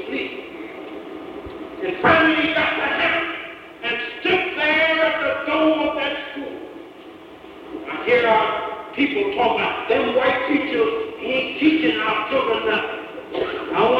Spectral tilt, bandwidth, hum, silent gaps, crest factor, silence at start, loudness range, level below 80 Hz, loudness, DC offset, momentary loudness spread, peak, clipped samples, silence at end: -6 dB/octave; 7.6 kHz; none; none; 18 dB; 0 s; 3 LU; -56 dBFS; -20 LUFS; under 0.1%; 18 LU; -4 dBFS; under 0.1%; 0 s